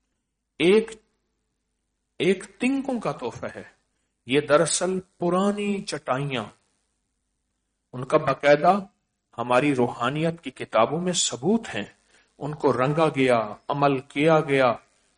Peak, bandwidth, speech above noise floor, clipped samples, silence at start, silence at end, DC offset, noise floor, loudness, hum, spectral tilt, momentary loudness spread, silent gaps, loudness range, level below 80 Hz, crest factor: -6 dBFS; 10 kHz; 55 dB; under 0.1%; 0.6 s; 0.4 s; under 0.1%; -78 dBFS; -23 LUFS; none; -4.5 dB/octave; 15 LU; none; 5 LU; -62 dBFS; 18 dB